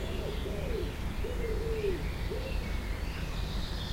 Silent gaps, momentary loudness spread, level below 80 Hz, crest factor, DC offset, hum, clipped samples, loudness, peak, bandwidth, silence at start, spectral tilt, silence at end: none; 4 LU; -36 dBFS; 14 dB; under 0.1%; none; under 0.1%; -36 LUFS; -20 dBFS; 16 kHz; 0 s; -6 dB/octave; 0 s